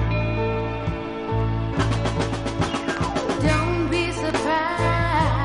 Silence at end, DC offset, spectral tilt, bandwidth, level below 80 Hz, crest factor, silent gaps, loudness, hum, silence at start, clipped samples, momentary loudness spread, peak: 0 s; under 0.1%; -6 dB/octave; 11.5 kHz; -32 dBFS; 16 dB; none; -23 LUFS; none; 0 s; under 0.1%; 5 LU; -8 dBFS